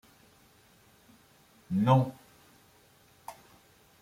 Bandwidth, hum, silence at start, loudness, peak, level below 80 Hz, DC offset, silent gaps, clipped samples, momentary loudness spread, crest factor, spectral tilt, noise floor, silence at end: 15.5 kHz; none; 1.7 s; -28 LUFS; -10 dBFS; -70 dBFS; under 0.1%; none; under 0.1%; 24 LU; 24 dB; -8 dB/octave; -62 dBFS; 0.7 s